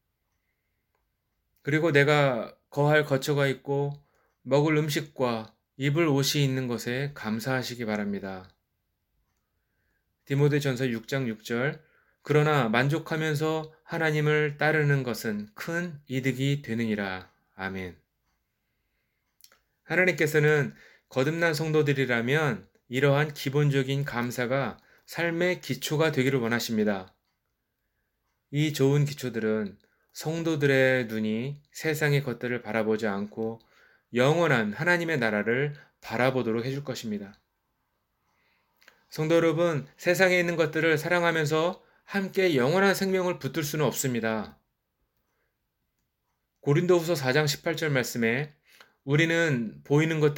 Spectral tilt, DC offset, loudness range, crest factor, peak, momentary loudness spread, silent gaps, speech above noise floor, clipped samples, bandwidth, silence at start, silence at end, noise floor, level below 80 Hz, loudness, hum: -5.5 dB/octave; under 0.1%; 6 LU; 22 dB; -6 dBFS; 12 LU; none; 53 dB; under 0.1%; 17 kHz; 1.65 s; 0 s; -79 dBFS; -68 dBFS; -26 LUFS; none